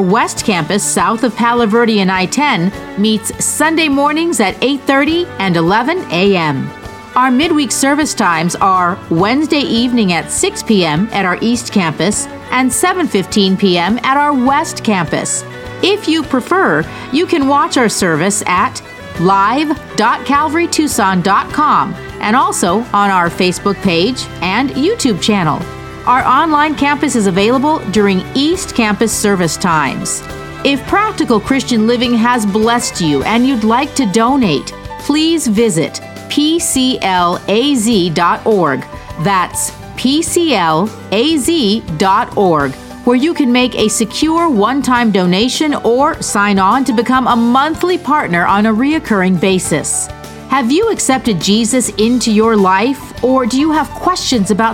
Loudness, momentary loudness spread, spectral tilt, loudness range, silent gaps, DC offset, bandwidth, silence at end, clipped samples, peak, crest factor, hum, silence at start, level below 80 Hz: -12 LUFS; 5 LU; -4 dB/octave; 2 LU; none; under 0.1%; 17 kHz; 0 s; under 0.1%; 0 dBFS; 12 dB; none; 0 s; -40 dBFS